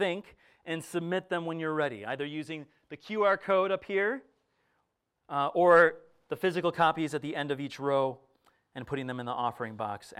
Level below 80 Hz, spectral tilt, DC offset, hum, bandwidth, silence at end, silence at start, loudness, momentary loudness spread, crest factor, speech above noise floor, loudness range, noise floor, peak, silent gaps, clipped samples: -72 dBFS; -5.5 dB/octave; under 0.1%; none; 14 kHz; 0.1 s; 0 s; -30 LUFS; 15 LU; 22 dB; 50 dB; 5 LU; -79 dBFS; -10 dBFS; none; under 0.1%